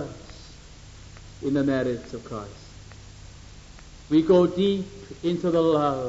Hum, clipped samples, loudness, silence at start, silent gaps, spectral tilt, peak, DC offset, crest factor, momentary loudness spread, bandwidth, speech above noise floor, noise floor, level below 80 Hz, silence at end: none; under 0.1%; -24 LUFS; 0 s; none; -7 dB/octave; -8 dBFS; under 0.1%; 18 dB; 26 LU; 8 kHz; 22 dB; -45 dBFS; -48 dBFS; 0 s